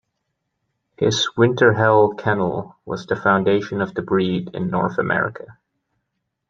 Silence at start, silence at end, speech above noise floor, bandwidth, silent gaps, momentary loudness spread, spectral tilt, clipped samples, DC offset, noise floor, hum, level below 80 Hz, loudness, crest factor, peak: 1 s; 0.95 s; 57 dB; 7.6 kHz; none; 11 LU; -5.5 dB/octave; under 0.1%; under 0.1%; -76 dBFS; none; -56 dBFS; -19 LUFS; 18 dB; -2 dBFS